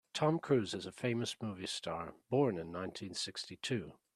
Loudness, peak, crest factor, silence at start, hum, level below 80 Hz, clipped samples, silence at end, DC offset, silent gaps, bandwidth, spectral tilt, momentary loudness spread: -38 LUFS; -18 dBFS; 18 dB; 0.15 s; none; -74 dBFS; under 0.1%; 0.25 s; under 0.1%; none; 13 kHz; -5 dB/octave; 9 LU